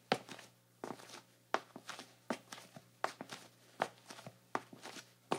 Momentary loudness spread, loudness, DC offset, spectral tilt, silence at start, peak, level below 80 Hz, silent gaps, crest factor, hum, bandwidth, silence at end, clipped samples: 12 LU; -46 LUFS; under 0.1%; -3.5 dB/octave; 0.1 s; -12 dBFS; under -90 dBFS; none; 32 dB; none; 16.5 kHz; 0 s; under 0.1%